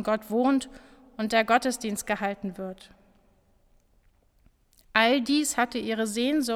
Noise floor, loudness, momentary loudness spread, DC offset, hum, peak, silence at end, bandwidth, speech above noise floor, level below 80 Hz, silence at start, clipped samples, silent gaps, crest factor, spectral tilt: -63 dBFS; -26 LUFS; 16 LU; under 0.1%; none; -4 dBFS; 0 s; 17 kHz; 37 dB; -60 dBFS; 0 s; under 0.1%; none; 24 dB; -3 dB/octave